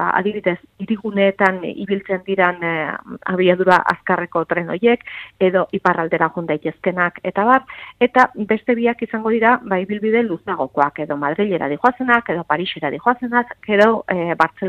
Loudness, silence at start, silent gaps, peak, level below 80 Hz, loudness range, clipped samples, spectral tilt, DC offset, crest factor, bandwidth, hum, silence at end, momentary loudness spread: -18 LUFS; 0 s; none; 0 dBFS; -58 dBFS; 2 LU; under 0.1%; -7 dB/octave; under 0.1%; 18 dB; 9.2 kHz; none; 0 s; 8 LU